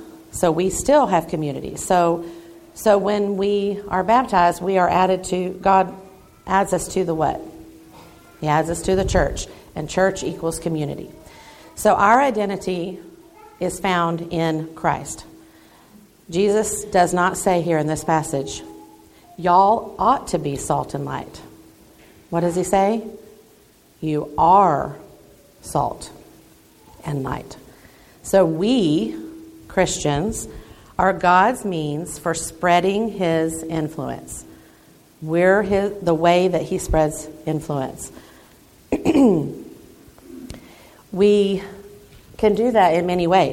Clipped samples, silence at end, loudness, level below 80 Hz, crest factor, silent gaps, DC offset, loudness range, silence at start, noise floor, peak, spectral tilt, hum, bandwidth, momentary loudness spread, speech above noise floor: under 0.1%; 0 s; -20 LUFS; -42 dBFS; 20 dB; none; under 0.1%; 5 LU; 0 s; -52 dBFS; -2 dBFS; -5 dB/octave; none; 16.5 kHz; 18 LU; 33 dB